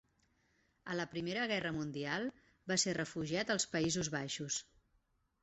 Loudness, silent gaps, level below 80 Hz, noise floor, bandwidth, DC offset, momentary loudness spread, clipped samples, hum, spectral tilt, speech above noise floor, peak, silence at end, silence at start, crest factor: -38 LUFS; none; -70 dBFS; -78 dBFS; 8.2 kHz; under 0.1%; 7 LU; under 0.1%; none; -3 dB/octave; 40 dB; -20 dBFS; 0.8 s; 0.85 s; 20 dB